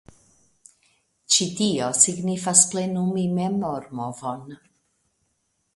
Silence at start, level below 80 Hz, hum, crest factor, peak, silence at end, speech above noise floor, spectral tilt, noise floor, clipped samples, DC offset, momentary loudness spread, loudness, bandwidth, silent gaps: 1.3 s; -64 dBFS; none; 26 dB; 0 dBFS; 1.2 s; 49 dB; -3 dB/octave; -72 dBFS; under 0.1%; under 0.1%; 15 LU; -21 LUFS; 11.5 kHz; none